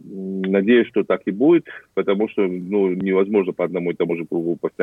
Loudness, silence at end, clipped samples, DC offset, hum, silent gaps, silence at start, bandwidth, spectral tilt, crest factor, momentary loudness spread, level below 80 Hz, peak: -20 LUFS; 0 s; under 0.1%; under 0.1%; none; none; 0.05 s; 3.9 kHz; -9 dB/octave; 16 dB; 8 LU; -68 dBFS; -4 dBFS